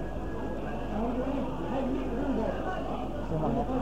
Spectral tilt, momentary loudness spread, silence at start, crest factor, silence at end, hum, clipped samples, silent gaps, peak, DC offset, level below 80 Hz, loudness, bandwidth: -8 dB/octave; 5 LU; 0 s; 14 dB; 0 s; none; under 0.1%; none; -18 dBFS; 1%; -40 dBFS; -33 LUFS; 9.8 kHz